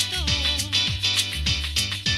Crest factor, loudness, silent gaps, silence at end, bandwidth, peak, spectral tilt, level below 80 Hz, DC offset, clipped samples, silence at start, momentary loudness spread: 18 dB; -22 LUFS; none; 0 s; 16 kHz; -6 dBFS; -2 dB/octave; -34 dBFS; under 0.1%; under 0.1%; 0 s; 3 LU